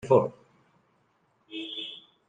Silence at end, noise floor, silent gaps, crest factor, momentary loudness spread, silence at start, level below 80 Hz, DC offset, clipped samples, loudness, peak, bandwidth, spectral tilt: 0.3 s; -69 dBFS; none; 24 dB; 16 LU; 0.05 s; -68 dBFS; under 0.1%; under 0.1%; -30 LUFS; -8 dBFS; 9.2 kHz; -7 dB/octave